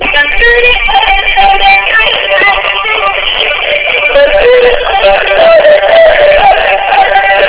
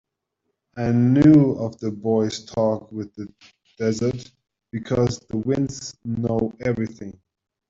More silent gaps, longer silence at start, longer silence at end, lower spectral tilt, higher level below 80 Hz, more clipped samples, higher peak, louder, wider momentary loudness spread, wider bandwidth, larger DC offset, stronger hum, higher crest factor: neither; second, 0 s vs 0.75 s; second, 0 s vs 0.55 s; second, -5.5 dB/octave vs -7.5 dB/octave; first, -26 dBFS vs -52 dBFS; first, 6% vs under 0.1%; first, 0 dBFS vs -4 dBFS; first, -5 LUFS vs -22 LUFS; second, 4 LU vs 20 LU; second, 4 kHz vs 7.8 kHz; first, 2% vs under 0.1%; neither; second, 6 dB vs 18 dB